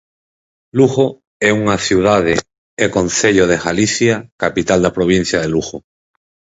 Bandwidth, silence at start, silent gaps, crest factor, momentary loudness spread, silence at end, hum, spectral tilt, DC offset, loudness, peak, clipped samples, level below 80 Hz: 8 kHz; 0.75 s; 1.27-1.40 s, 2.58-2.77 s, 4.32-4.39 s; 16 dB; 7 LU; 0.7 s; none; -4.5 dB/octave; under 0.1%; -15 LUFS; 0 dBFS; under 0.1%; -42 dBFS